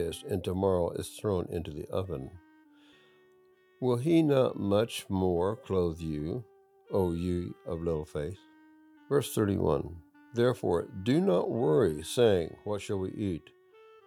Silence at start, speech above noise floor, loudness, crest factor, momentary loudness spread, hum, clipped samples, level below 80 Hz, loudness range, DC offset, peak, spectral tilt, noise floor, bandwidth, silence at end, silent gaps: 0 s; 34 dB; -30 LUFS; 18 dB; 12 LU; none; under 0.1%; -58 dBFS; 6 LU; under 0.1%; -12 dBFS; -6.5 dB/octave; -63 dBFS; 19 kHz; 0.65 s; none